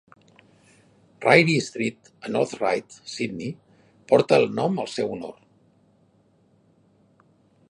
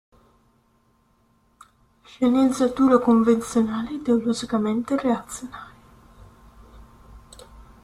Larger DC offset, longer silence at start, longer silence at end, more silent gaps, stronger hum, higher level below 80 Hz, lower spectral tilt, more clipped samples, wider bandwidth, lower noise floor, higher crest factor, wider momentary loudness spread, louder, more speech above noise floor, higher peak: neither; second, 1.2 s vs 2.2 s; first, 2.35 s vs 0.25 s; neither; neither; second, -68 dBFS vs -54 dBFS; about the same, -5.5 dB/octave vs -5.5 dB/octave; neither; second, 11.5 kHz vs 13 kHz; about the same, -61 dBFS vs -63 dBFS; about the same, 24 dB vs 20 dB; first, 19 LU vs 13 LU; about the same, -23 LUFS vs -21 LUFS; about the same, 39 dB vs 42 dB; first, 0 dBFS vs -4 dBFS